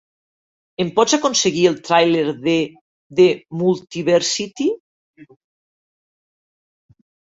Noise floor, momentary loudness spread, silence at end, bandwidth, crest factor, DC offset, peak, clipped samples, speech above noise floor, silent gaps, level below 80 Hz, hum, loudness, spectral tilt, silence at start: under -90 dBFS; 9 LU; 2.05 s; 8 kHz; 18 dB; under 0.1%; -2 dBFS; under 0.1%; over 73 dB; 2.81-3.10 s, 4.80-5.14 s; -62 dBFS; none; -18 LUFS; -4 dB/octave; 0.8 s